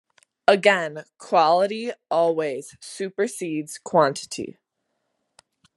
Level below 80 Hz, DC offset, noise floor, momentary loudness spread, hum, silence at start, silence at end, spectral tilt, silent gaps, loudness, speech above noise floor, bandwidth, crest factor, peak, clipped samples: -76 dBFS; under 0.1%; -77 dBFS; 15 LU; none; 0.5 s; 1.25 s; -4 dB/octave; none; -22 LUFS; 54 dB; 12.5 kHz; 22 dB; -2 dBFS; under 0.1%